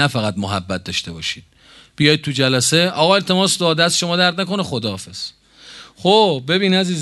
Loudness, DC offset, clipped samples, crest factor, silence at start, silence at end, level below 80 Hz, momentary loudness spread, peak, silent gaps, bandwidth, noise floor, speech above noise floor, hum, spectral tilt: -16 LUFS; under 0.1%; under 0.1%; 18 dB; 0 s; 0 s; -50 dBFS; 11 LU; 0 dBFS; none; 12.5 kHz; -41 dBFS; 24 dB; none; -4 dB/octave